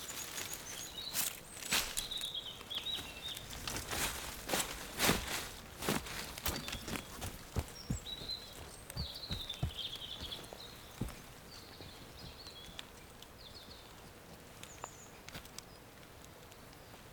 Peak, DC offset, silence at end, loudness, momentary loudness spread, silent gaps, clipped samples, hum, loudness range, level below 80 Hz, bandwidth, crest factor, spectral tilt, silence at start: -14 dBFS; under 0.1%; 0 s; -40 LUFS; 18 LU; none; under 0.1%; none; 14 LU; -54 dBFS; over 20 kHz; 28 dB; -2.5 dB/octave; 0 s